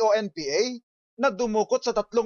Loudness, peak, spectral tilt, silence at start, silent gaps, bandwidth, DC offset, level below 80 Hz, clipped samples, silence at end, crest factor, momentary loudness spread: -25 LUFS; -12 dBFS; -3.5 dB/octave; 0 s; 0.83-1.17 s; 7.2 kHz; under 0.1%; -62 dBFS; under 0.1%; 0 s; 12 dB; 4 LU